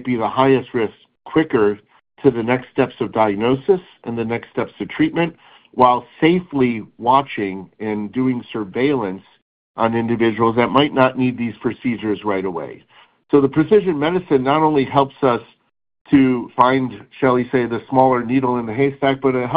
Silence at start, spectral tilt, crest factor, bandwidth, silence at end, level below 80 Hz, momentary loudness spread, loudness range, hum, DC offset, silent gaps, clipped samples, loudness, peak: 0 s; -10 dB/octave; 18 dB; 5 kHz; 0 s; -52 dBFS; 10 LU; 3 LU; none; under 0.1%; 9.42-9.75 s, 16.01-16.05 s; under 0.1%; -18 LUFS; 0 dBFS